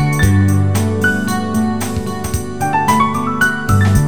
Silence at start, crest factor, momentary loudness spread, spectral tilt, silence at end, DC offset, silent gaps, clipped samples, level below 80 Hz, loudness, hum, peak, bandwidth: 0 s; 14 dB; 8 LU; -5.5 dB/octave; 0 s; 3%; none; under 0.1%; -30 dBFS; -15 LUFS; none; 0 dBFS; 19.5 kHz